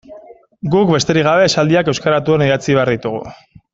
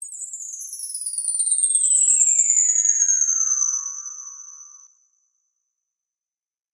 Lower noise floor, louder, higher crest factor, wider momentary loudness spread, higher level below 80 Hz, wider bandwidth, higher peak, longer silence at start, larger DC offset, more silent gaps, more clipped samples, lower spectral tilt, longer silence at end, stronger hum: second, -40 dBFS vs under -90 dBFS; about the same, -14 LUFS vs -16 LUFS; about the same, 14 dB vs 18 dB; second, 12 LU vs 17 LU; first, -48 dBFS vs under -90 dBFS; second, 7.8 kHz vs 11.5 kHz; first, 0 dBFS vs -4 dBFS; about the same, 0.1 s vs 0 s; neither; neither; neither; first, -5.5 dB/octave vs 12 dB/octave; second, 0.4 s vs 1.95 s; neither